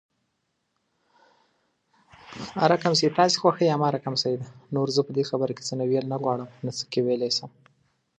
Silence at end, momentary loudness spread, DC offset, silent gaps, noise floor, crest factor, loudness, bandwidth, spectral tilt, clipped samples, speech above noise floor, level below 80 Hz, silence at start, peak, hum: 0.7 s; 12 LU; under 0.1%; none; -76 dBFS; 22 dB; -25 LUFS; 10 kHz; -5 dB/octave; under 0.1%; 52 dB; -70 dBFS; 2.3 s; -4 dBFS; none